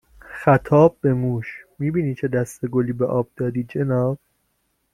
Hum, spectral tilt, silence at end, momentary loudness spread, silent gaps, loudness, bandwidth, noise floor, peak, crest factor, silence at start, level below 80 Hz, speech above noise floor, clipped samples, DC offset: none; -9 dB/octave; 0.75 s; 11 LU; none; -21 LUFS; 13.5 kHz; -70 dBFS; -2 dBFS; 18 dB; 0.3 s; -50 dBFS; 50 dB; under 0.1%; under 0.1%